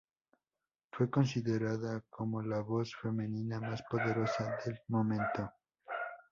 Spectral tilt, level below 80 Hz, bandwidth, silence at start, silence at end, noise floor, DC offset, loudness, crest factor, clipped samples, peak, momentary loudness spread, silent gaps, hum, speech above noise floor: -7 dB/octave; -68 dBFS; 7.4 kHz; 0.95 s; 0.1 s; under -90 dBFS; under 0.1%; -36 LUFS; 20 dB; under 0.1%; -18 dBFS; 9 LU; none; none; over 55 dB